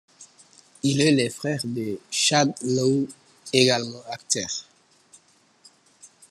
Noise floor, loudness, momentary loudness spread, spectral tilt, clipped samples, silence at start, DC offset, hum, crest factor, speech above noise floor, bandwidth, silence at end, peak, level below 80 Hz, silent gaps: -59 dBFS; -23 LUFS; 14 LU; -3.5 dB/octave; under 0.1%; 0.2 s; under 0.1%; none; 24 dB; 36 dB; 13 kHz; 0.25 s; -2 dBFS; -68 dBFS; none